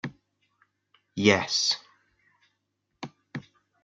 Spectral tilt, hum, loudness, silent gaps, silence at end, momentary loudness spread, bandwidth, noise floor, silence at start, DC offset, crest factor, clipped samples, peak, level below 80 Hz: -3 dB/octave; 50 Hz at -50 dBFS; -24 LUFS; none; 0.45 s; 22 LU; 9.2 kHz; -79 dBFS; 0.05 s; under 0.1%; 26 dB; under 0.1%; -6 dBFS; -70 dBFS